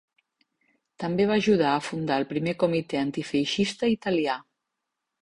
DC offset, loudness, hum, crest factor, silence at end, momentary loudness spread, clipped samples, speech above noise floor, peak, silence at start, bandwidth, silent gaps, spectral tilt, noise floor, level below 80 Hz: under 0.1%; -26 LUFS; none; 18 dB; 0.8 s; 7 LU; under 0.1%; 58 dB; -10 dBFS; 1 s; 11.5 kHz; none; -5.5 dB/octave; -83 dBFS; -62 dBFS